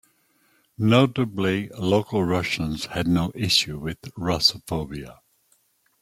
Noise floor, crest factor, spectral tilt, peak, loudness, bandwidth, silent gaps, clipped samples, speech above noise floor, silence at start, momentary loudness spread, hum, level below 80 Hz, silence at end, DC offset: -65 dBFS; 22 dB; -5 dB/octave; -2 dBFS; -23 LUFS; 16.5 kHz; none; under 0.1%; 42 dB; 0.8 s; 12 LU; none; -50 dBFS; 0.9 s; under 0.1%